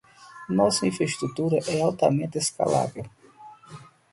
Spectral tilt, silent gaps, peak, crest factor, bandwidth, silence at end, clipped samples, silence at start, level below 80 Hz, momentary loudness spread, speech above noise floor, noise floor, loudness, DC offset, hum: -5 dB/octave; none; -6 dBFS; 20 dB; 11.5 kHz; 0.3 s; under 0.1%; 0.2 s; -62 dBFS; 21 LU; 24 dB; -49 dBFS; -25 LUFS; under 0.1%; none